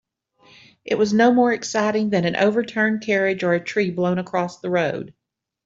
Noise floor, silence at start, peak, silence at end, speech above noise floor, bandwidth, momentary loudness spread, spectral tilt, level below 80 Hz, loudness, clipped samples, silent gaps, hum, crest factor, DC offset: -56 dBFS; 0.85 s; -4 dBFS; 0.55 s; 36 dB; 7.8 kHz; 9 LU; -5.5 dB/octave; -64 dBFS; -20 LUFS; under 0.1%; none; none; 16 dB; under 0.1%